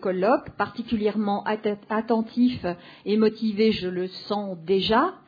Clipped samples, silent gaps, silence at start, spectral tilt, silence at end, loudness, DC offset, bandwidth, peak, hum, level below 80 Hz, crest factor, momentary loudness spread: under 0.1%; none; 0 s; -8 dB/octave; 0.1 s; -25 LUFS; under 0.1%; 5 kHz; -8 dBFS; none; -56 dBFS; 16 dB; 8 LU